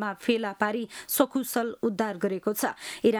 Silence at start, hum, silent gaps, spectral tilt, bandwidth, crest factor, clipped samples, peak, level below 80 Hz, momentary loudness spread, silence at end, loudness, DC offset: 0 s; none; none; -4 dB/octave; over 20 kHz; 20 dB; under 0.1%; -8 dBFS; -70 dBFS; 4 LU; 0 s; -28 LUFS; under 0.1%